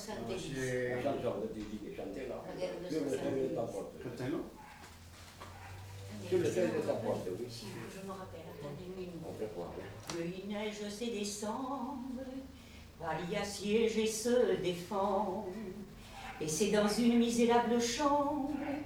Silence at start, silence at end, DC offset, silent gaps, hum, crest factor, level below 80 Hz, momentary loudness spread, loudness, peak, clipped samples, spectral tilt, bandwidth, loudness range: 0 s; 0 s; under 0.1%; none; none; 20 dB; -60 dBFS; 18 LU; -36 LUFS; -18 dBFS; under 0.1%; -4.5 dB/octave; over 20 kHz; 9 LU